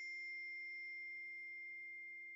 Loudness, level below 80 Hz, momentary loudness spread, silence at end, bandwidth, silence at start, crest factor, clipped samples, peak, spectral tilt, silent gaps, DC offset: -48 LUFS; under -90 dBFS; 3 LU; 0 s; 10.5 kHz; 0 s; 6 dB; under 0.1%; -44 dBFS; 0 dB/octave; none; under 0.1%